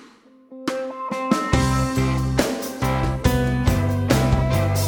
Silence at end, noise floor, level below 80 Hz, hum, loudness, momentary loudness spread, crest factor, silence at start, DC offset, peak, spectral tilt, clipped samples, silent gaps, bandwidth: 0 s; -49 dBFS; -30 dBFS; none; -21 LUFS; 8 LU; 18 dB; 0 s; under 0.1%; -4 dBFS; -6 dB/octave; under 0.1%; none; over 20 kHz